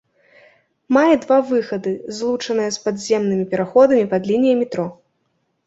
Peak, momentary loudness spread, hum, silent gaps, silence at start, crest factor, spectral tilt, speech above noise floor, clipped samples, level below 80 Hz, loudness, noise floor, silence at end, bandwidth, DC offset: -2 dBFS; 10 LU; none; none; 0.9 s; 16 dB; -5.5 dB/octave; 51 dB; under 0.1%; -62 dBFS; -18 LUFS; -68 dBFS; 0.75 s; 8 kHz; under 0.1%